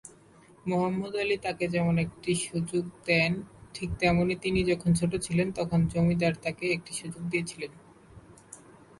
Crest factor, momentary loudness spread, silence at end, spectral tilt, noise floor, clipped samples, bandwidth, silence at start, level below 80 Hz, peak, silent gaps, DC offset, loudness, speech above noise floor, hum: 18 dB; 13 LU; 0.3 s; -5.5 dB/octave; -56 dBFS; under 0.1%; 11.5 kHz; 0.05 s; -50 dBFS; -10 dBFS; none; under 0.1%; -28 LUFS; 28 dB; none